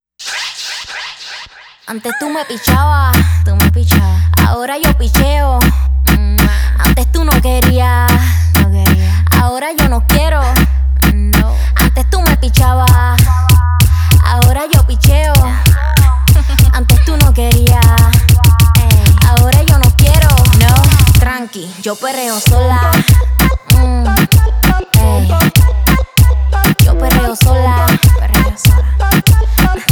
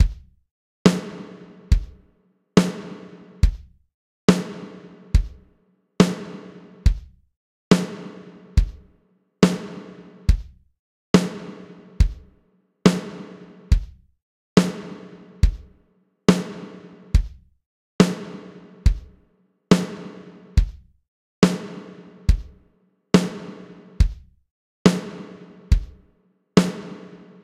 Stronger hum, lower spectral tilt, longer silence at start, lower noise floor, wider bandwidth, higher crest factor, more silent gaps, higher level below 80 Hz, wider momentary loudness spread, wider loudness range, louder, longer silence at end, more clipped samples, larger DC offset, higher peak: neither; second, -5 dB/octave vs -6.5 dB/octave; first, 0.2 s vs 0 s; second, -34 dBFS vs -63 dBFS; first, over 20 kHz vs 13.5 kHz; second, 8 dB vs 22 dB; second, none vs 0.51-0.85 s, 3.94-4.28 s, 7.36-7.71 s, 10.79-11.14 s, 14.22-14.56 s, 17.66-17.99 s, 21.08-21.42 s, 24.51-24.85 s; first, -12 dBFS vs -28 dBFS; second, 8 LU vs 22 LU; about the same, 4 LU vs 2 LU; first, -10 LUFS vs -22 LUFS; second, 0 s vs 0.45 s; neither; neither; about the same, 0 dBFS vs 0 dBFS